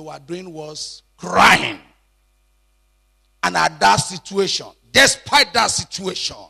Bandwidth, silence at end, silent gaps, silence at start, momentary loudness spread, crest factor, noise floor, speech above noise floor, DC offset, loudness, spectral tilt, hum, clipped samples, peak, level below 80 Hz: 14 kHz; 0.05 s; none; 0 s; 19 LU; 18 dB; -60 dBFS; 42 dB; under 0.1%; -16 LUFS; -2 dB/octave; none; under 0.1%; -2 dBFS; -50 dBFS